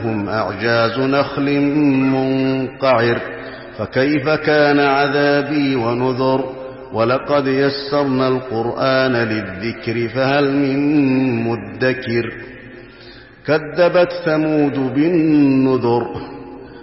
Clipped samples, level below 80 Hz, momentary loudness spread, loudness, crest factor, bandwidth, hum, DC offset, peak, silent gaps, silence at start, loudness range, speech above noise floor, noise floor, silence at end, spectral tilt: under 0.1%; -50 dBFS; 12 LU; -17 LUFS; 12 dB; 5.8 kHz; none; under 0.1%; -4 dBFS; none; 0 s; 3 LU; 24 dB; -40 dBFS; 0 s; -10 dB/octave